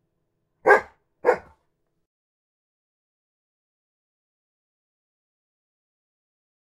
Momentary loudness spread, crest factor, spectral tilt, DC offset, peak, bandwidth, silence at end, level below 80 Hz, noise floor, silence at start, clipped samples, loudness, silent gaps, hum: 7 LU; 28 dB; -4.5 dB/octave; under 0.1%; -2 dBFS; 14 kHz; 5.35 s; -68 dBFS; -75 dBFS; 0.65 s; under 0.1%; -22 LUFS; none; none